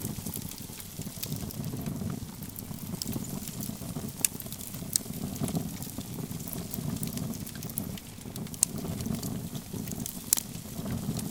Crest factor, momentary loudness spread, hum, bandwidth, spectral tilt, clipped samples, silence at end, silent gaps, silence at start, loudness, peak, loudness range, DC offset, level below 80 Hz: 36 dB; 11 LU; none; 19 kHz; -4 dB/octave; under 0.1%; 0 s; none; 0 s; -34 LUFS; 0 dBFS; 4 LU; under 0.1%; -52 dBFS